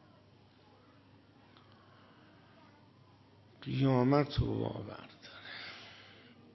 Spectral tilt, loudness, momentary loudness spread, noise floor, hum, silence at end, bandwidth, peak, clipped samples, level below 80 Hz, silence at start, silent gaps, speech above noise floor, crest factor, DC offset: -9 dB/octave; -34 LUFS; 24 LU; -62 dBFS; none; 0.5 s; 6 kHz; -14 dBFS; under 0.1%; -56 dBFS; 3.6 s; none; 31 dB; 24 dB; under 0.1%